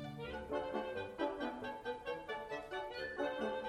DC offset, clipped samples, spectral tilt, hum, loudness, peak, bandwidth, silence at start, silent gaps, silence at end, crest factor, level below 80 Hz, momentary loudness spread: under 0.1%; under 0.1%; -5.5 dB/octave; none; -42 LUFS; -26 dBFS; 13.5 kHz; 0 s; none; 0 s; 16 dB; -64 dBFS; 4 LU